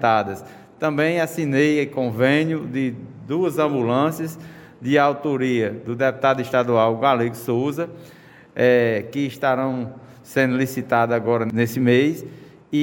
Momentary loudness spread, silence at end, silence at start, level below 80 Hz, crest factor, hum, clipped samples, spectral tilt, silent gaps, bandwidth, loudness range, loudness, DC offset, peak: 12 LU; 0 s; 0 s; -64 dBFS; 18 dB; none; under 0.1%; -6.5 dB/octave; none; 17 kHz; 2 LU; -21 LUFS; under 0.1%; -4 dBFS